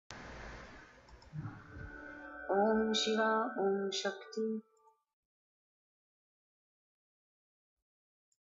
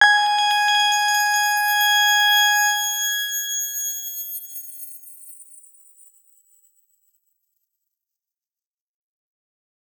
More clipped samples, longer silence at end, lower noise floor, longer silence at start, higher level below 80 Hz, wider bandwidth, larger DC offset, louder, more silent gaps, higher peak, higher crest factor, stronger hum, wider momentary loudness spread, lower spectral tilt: neither; second, 3.8 s vs 4.55 s; second, -58 dBFS vs under -90 dBFS; about the same, 0.1 s vs 0 s; first, -64 dBFS vs under -90 dBFS; second, 8 kHz vs over 20 kHz; neither; second, -34 LUFS vs -18 LUFS; neither; second, -22 dBFS vs -2 dBFS; about the same, 18 dB vs 22 dB; neither; about the same, 19 LU vs 20 LU; first, -4 dB/octave vs 7 dB/octave